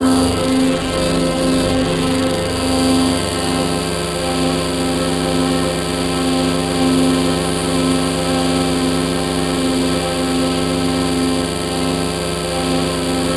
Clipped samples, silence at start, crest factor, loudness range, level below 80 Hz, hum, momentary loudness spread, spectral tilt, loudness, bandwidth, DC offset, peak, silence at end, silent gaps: under 0.1%; 0 s; 14 dB; 1 LU; -32 dBFS; none; 3 LU; -4.5 dB/octave; -17 LUFS; 14 kHz; under 0.1%; -4 dBFS; 0 s; none